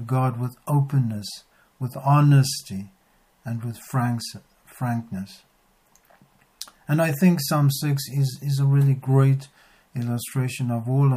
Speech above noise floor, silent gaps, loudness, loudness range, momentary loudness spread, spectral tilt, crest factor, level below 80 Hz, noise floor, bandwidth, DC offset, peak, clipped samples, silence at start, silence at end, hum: 40 dB; none; -23 LUFS; 9 LU; 17 LU; -6.5 dB/octave; 16 dB; -66 dBFS; -62 dBFS; 15.5 kHz; under 0.1%; -8 dBFS; under 0.1%; 0 s; 0 s; none